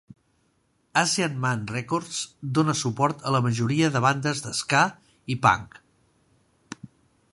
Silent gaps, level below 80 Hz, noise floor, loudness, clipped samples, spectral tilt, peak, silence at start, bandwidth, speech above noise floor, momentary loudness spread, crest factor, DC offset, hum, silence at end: none; -60 dBFS; -68 dBFS; -24 LUFS; under 0.1%; -4.5 dB/octave; -4 dBFS; 0.95 s; 11.5 kHz; 44 dB; 11 LU; 22 dB; under 0.1%; none; 0.45 s